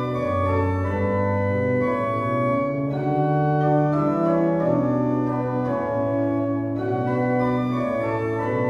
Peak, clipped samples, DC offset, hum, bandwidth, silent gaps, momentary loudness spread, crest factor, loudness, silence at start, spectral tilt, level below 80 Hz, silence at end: -8 dBFS; under 0.1%; under 0.1%; none; 7.4 kHz; none; 4 LU; 14 dB; -22 LUFS; 0 s; -9.5 dB/octave; -52 dBFS; 0 s